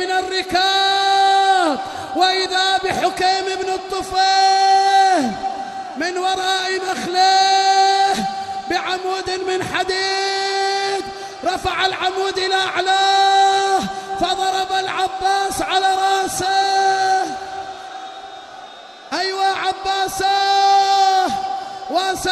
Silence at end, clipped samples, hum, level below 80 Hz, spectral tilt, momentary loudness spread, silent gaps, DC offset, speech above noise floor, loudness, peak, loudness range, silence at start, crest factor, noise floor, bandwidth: 0 s; under 0.1%; none; -52 dBFS; -1.5 dB/octave; 12 LU; none; under 0.1%; 20 dB; -17 LUFS; -4 dBFS; 4 LU; 0 s; 14 dB; -38 dBFS; 12.5 kHz